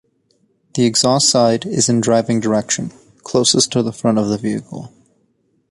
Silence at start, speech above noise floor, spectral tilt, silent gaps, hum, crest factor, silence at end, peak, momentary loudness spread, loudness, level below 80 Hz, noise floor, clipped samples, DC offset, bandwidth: 0.75 s; 47 dB; -4 dB/octave; none; none; 16 dB; 0.85 s; -2 dBFS; 13 LU; -16 LUFS; -54 dBFS; -62 dBFS; under 0.1%; under 0.1%; 11.5 kHz